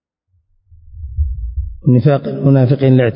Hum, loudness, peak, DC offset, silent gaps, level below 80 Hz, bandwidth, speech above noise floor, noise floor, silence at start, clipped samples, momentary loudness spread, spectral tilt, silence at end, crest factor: none; -14 LUFS; -2 dBFS; under 0.1%; none; -26 dBFS; 5.4 kHz; 52 dB; -62 dBFS; 0.9 s; under 0.1%; 14 LU; -14 dB/octave; 0 s; 14 dB